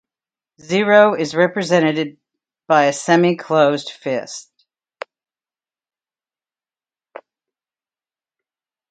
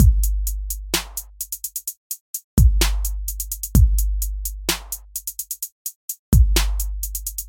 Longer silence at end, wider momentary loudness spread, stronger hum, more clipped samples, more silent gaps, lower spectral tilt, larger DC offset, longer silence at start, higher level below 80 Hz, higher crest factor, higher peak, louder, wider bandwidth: first, 4.5 s vs 0 s; first, 21 LU vs 12 LU; neither; neither; second, none vs 1.97-2.10 s, 2.21-2.34 s, 2.44-2.57 s, 5.72-5.85 s, 5.96-6.08 s, 6.19-6.32 s; about the same, -5 dB/octave vs -4 dB/octave; neither; first, 0.7 s vs 0 s; second, -70 dBFS vs -22 dBFS; about the same, 20 dB vs 20 dB; about the same, 0 dBFS vs -2 dBFS; first, -16 LUFS vs -23 LUFS; second, 9.4 kHz vs 17 kHz